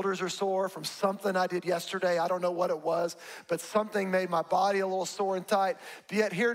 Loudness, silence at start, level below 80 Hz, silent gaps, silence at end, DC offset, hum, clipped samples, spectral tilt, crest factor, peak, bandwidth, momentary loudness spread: -30 LUFS; 0 s; -80 dBFS; none; 0 s; under 0.1%; none; under 0.1%; -4.5 dB/octave; 16 dB; -14 dBFS; 16 kHz; 6 LU